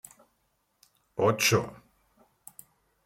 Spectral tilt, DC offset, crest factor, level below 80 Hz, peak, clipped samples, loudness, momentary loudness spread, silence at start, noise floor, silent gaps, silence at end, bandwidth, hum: -3.5 dB/octave; under 0.1%; 22 dB; -68 dBFS; -10 dBFS; under 0.1%; -25 LUFS; 26 LU; 1.15 s; -74 dBFS; none; 1.3 s; 16.5 kHz; none